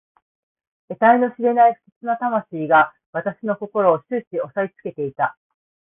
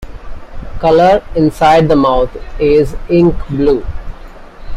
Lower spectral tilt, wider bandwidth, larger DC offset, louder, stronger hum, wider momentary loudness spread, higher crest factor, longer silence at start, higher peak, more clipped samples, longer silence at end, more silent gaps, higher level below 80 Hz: first, -11 dB/octave vs -7.5 dB/octave; second, 3.8 kHz vs 14 kHz; neither; second, -20 LUFS vs -11 LUFS; neither; second, 12 LU vs 20 LU; first, 18 dB vs 12 dB; first, 0.9 s vs 0 s; about the same, -2 dBFS vs 0 dBFS; neither; first, 0.55 s vs 0 s; first, 1.92-2.01 s, 3.06-3.13 s, 4.27-4.31 s vs none; second, -64 dBFS vs -24 dBFS